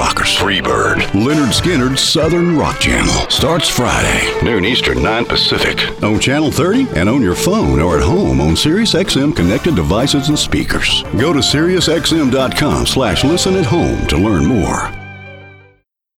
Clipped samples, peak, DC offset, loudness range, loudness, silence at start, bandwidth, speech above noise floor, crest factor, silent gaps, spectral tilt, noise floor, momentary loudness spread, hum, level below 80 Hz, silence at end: under 0.1%; -2 dBFS; under 0.1%; 1 LU; -13 LUFS; 0 s; 17 kHz; 40 dB; 10 dB; none; -4.5 dB/octave; -53 dBFS; 3 LU; none; -26 dBFS; 0.65 s